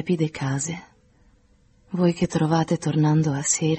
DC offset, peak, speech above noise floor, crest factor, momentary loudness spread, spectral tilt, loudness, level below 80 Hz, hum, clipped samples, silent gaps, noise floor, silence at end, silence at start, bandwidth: under 0.1%; -6 dBFS; 36 dB; 16 dB; 8 LU; -5.5 dB/octave; -23 LUFS; -56 dBFS; none; under 0.1%; none; -58 dBFS; 0 s; 0 s; 8.8 kHz